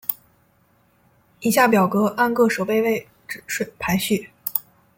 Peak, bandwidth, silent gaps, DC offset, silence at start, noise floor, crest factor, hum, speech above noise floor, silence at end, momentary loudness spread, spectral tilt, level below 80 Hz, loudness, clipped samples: -2 dBFS; 17 kHz; none; under 0.1%; 0.1 s; -60 dBFS; 20 dB; none; 41 dB; 0.35 s; 11 LU; -5 dB/octave; -56 dBFS; -21 LUFS; under 0.1%